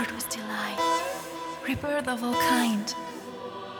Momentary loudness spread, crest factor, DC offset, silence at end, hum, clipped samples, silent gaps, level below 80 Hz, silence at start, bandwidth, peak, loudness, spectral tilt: 14 LU; 18 dB; under 0.1%; 0 s; none; under 0.1%; none; -58 dBFS; 0 s; over 20 kHz; -12 dBFS; -28 LUFS; -3 dB/octave